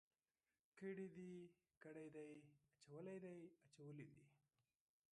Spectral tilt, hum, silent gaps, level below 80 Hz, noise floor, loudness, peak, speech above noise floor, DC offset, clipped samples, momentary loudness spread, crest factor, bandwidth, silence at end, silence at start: -7.5 dB/octave; none; 1.77-1.81 s; under -90 dBFS; under -90 dBFS; -59 LUFS; -42 dBFS; over 32 dB; under 0.1%; under 0.1%; 12 LU; 18 dB; 10.5 kHz; 0.75 s; 0.75 s